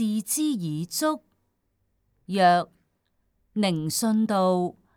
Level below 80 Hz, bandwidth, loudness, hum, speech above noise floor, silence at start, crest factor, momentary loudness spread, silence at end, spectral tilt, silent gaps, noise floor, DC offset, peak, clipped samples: -72 dBFS; 19 kHz; -25 LUFS; none; 49 dB; 0 s; 18 dB; 10 LU; 0.25 s; -4.5 dB/octave; none; -73 dBFS; under 0.1%; -8 dBFS; under 0.1%